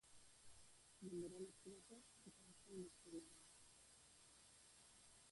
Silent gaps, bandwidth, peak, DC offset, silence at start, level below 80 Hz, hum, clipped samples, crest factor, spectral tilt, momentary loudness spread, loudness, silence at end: none; 11.5 kHz; -42 dBFS; under 0.1%; 0.05 s; -84 dBFS; none; under 0.1%; 18 dB; -4.5 dB/octave; 13 LU; -61 LUFS; 0 s